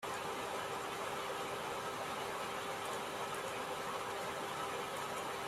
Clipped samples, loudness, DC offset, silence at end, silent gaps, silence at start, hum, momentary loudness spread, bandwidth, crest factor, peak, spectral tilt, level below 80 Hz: under 0.1%; -41 LUFS; under 0.1%; 0 s; none; 0 s; none; 0 LU; 16 kHz; 14 dB; -28 dBFS; -2.5 dB/octave; -72 dBFS